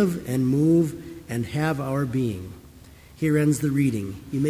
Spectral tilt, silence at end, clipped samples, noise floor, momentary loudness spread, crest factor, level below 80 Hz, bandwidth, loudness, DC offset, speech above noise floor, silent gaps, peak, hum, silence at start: -7 dB/octave; 0 s; under 0.1%; -47 dBFS; 12 LU; 14 dB; -50 dBFS; 16 kHz; -24 LUFS; under 0.1%; 25 dB; none; -10 dBFS; none; 0 s